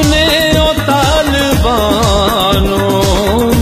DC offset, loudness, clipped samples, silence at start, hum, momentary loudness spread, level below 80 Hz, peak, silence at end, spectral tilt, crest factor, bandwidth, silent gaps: under 0.1%; -10 LUFS; under 0.1%; 0 s; none; 2 LU; -20 dBFS; 0 dBFS; 0 s; -4.5 dB/octave; 10 dB; 15.5 kHz; none